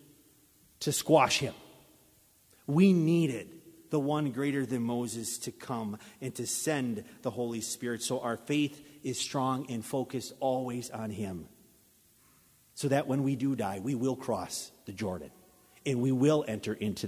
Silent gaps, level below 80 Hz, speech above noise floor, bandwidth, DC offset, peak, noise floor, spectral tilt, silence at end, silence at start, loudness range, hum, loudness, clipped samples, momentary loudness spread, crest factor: none; -66 dBFS; 33 dB; 16 kHz; under 0.1%; -10 dBFS; -64 dBFS; -5 dB/octave; 0 s; 0.8 s; 6 LU; none; -32 LUFS; under 0.1%; 14 LU; 22 dB